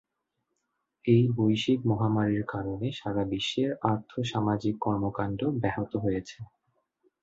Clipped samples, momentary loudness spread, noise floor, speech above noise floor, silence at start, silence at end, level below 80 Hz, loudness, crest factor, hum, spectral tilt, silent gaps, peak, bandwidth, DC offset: under 0.1%; 8 LU; -81 dBFS; 54 dB; 1.05 s; 0.75 s; -56 dBFS; -28 LUFS; 20 dB; none; -7 dB/octave; none; -10 dBFS; 8 kHz; under 0.1%